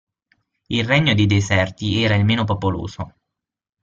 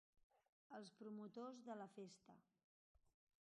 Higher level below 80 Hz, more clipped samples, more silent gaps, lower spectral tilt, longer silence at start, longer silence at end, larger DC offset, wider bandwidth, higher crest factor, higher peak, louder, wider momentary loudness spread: first, -48 dBFS vs under -90 dBFS; neither; second, none vs 0.23-0.30 s, 0.49-0.70 s, 2.64-2.95 s; about the same, -6 dB/octave vs -5.5 dB/octave; first, 0.7 s vs 0.15 s; first, 0.75 s vs 0.4 s; neither; second, 7.6 kHz vs 10 kHz; about the same, 18 dB vs 18 dB; first, -2 dBFS vs -42 dBFS; first, -18 LUFS vs -58 LUFS; first, 13 LU vs 7 LU